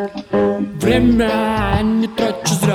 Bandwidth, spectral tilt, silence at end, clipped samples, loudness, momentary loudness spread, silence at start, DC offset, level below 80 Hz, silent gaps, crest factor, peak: 16 kHz; -5.5 dB/octave; 0 s; under 0.1%; -16 LUFS; 5 LU; 0 s; under 0.1%; -32 dBFS; none; 14 dB; -2 dBFS